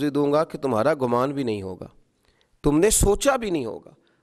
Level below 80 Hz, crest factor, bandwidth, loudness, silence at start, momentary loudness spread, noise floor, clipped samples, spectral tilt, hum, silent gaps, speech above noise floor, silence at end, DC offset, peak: -36 dBFS; 18 dB; 14.5 kHz; -22 LUFS; 0 s; 15 LU; -64 dBFS; under 0.1%; -4.5 dB/octave; none; none; 42 dB; 0.45 s; under 0.1%; -6 dBFS